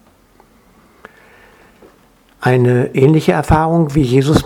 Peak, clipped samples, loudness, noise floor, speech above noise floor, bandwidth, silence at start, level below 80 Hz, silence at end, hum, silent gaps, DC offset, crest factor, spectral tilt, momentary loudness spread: 0 dBFS; under 0.1%; -13 LUFS; -50 dBFS; 38 dB; 15.5 kHz; 2.4 s; -34 dBFS; 0 s; none; none; under 0.1%; 16 dB; -7.5 dB/octave; 3 LU